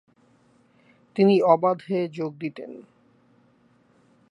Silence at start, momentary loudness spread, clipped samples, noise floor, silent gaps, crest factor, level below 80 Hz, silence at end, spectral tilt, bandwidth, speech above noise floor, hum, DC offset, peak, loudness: 1.15 s; 22 LU; under 0.1%; -61 dBFS; none; 22 dB; -78 dBFS; 1.5 s; -8.5 dB/octave; 10 kHz; 39 dB; none; under 0.1%; -4 dBFS; -23 LUFS